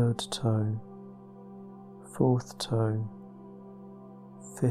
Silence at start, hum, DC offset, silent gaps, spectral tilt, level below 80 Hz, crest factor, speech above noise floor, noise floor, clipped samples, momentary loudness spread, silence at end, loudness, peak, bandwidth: 0 s; none; under 0.1%; none; -6.5 dB/octave; -64 dBFS; 18 dB; 19 dB; -48 dBFS; under 0.1%; 21 LU; 0 s; -30 LUFS; -12 dBFS; 13 kHz